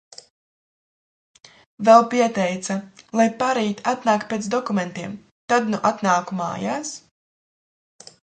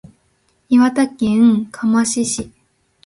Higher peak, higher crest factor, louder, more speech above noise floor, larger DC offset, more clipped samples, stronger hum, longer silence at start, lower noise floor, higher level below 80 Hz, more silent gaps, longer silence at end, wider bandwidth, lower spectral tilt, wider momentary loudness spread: about the same, 0 dBFS vs -2 dBFS; first, 22 dB vs 14 dB; second, -21 LUFS vs -16 LUFS; first, over 70 dB vs 47 dB; neither; neither; neither; first, 1.8 s vs 0.7 s; first, under -90 dBFS vs -61 dBFS; second, -68 dBFS vs -52 dBFS; first, 5.31-5.48 s vs none; first, 1.4 s vs 0.6 s; second, 9.4 kHz vs 11.5 kHz; about the same, -5 dB/octave vs -4.5 dB/octave; first, 15 LU vs 8 LU